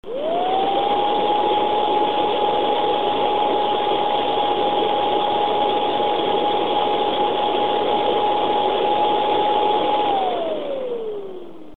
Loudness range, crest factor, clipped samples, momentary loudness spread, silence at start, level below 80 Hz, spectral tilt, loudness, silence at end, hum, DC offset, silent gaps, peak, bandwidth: 1 LU; 14 dB; under 0.1%; 5 LU; 0 s; -58 dBFS; -6 dB/octave; -20 LUFS; 0 s; none; 2%; none; -6 dBFS; 4.5 kHz